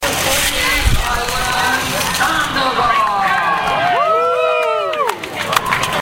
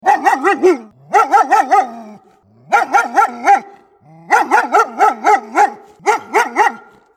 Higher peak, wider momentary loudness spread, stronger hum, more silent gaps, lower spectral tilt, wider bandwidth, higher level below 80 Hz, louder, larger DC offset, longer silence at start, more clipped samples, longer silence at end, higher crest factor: about the same, 0 dBFS vs 0 dBFS; about the same, 3 LU vs 5 LU; neither; neither; about the same, -2.5 dB/octave vs -2.5 dB/octave; first, 17 kHz vs 15 kHz; first, -28 dBFS vs -72 dBFS; about the same, -15 LUFS vs -13 LUFS; neither; about the same, 0 s vs 0.05 s; neither; second, 0 s vs 0.4 s; about the same, 16 dB vs 14 dB